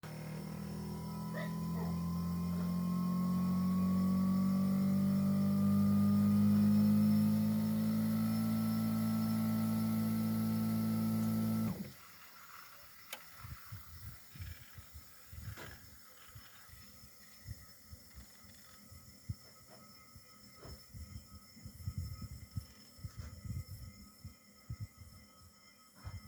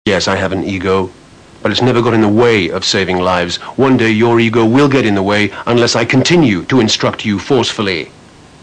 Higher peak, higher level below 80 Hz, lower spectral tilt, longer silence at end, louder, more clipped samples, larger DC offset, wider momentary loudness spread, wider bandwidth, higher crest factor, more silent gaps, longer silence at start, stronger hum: second, -22 dBFS vs -2 dBFS; second, -60 dBFS vs -44 dBFS; first, -7.5 dB/octave vs -5 dB/octave; second, 0 s vs 0.55 s; second, -34 LUFS vs -12 LUFS; neither; neither; first, 24 LU vs 7 LU; first, over 20 kHz vs 10 kHz; about the same, 14 dB vs 10 dB; neither; about the same, 0.05 s vs 0.05 s; neither